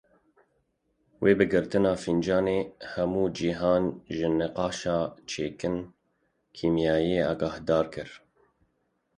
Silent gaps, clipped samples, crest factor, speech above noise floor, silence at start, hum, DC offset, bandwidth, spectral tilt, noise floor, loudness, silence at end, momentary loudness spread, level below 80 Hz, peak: none; under 0.1%; 20 dB; 48 dB; 1.2 s; none; under 0.1%; 10.5 kHz; -6 dB/octave; -74 dBFS; -27 LUFS; 1 s; 9 LU; -54 dBFS; -8 dBFS